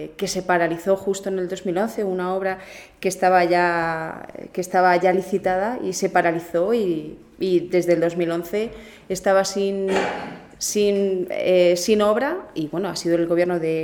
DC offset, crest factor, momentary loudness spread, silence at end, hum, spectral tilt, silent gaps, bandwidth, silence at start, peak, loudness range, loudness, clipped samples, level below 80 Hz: under 0.1%; 16 dB; 11 LU; 0 s; none; -4.5 dB/octave; none; 19 kHz; 0 s; -4 dBFS; 2 LU; -21 LUFS; under 0.1%; -56 dBFS